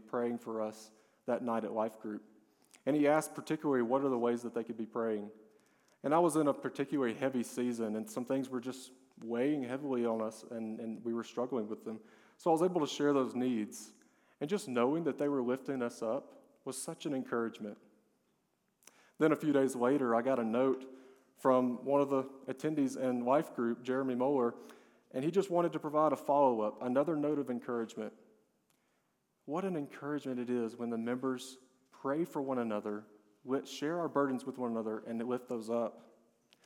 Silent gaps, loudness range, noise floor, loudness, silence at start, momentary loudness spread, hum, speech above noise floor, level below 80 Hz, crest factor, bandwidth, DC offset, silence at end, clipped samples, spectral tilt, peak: none; 6 LU; -79 dBFS; -35 LUFS; 0.05 s; 12 LU; none; 45 dB; under -90 dBFS; 20 dB; 17 kHz; under 0.1%; 0.65 s; under 0.1%; -6 dB/octave; -16 dBFS